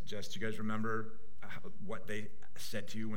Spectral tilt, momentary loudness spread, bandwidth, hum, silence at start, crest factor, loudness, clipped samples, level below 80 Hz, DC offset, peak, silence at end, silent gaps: -5 dB/octave; 13 LU; 16.5 kHz; none; 0 s; 18 dB; -42 LUFS; under 0.1%; -68 dBFS; 3%; -22 dBFS; 0 s; none